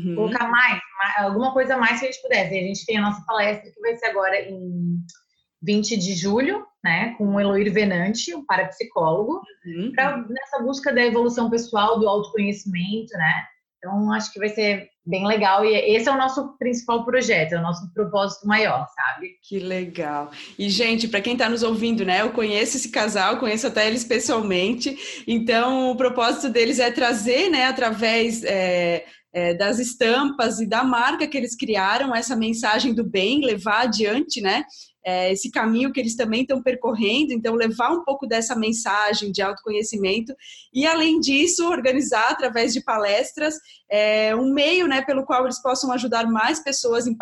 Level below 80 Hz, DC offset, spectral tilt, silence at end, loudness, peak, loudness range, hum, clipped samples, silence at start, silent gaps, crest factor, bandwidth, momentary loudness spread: -60 dBFS; under 0.1%; -3.5 dB/octave; 0 s; -21 LUFS; -4 dBFS; 3 LU; none; under 0.1%; 0 s; none; 18 dB; 12.5 kHz; 8 LU